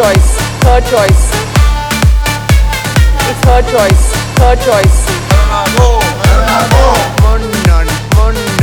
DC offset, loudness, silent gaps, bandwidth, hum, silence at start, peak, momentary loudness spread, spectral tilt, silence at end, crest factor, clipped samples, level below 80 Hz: under 0.1%; -9 LUFS; none; 19 kHz; none; 0 s; 0 dBFS; 3 LU; -5 dB/octave; 0 s; 8 dB; under 0.1%; -10 dBFS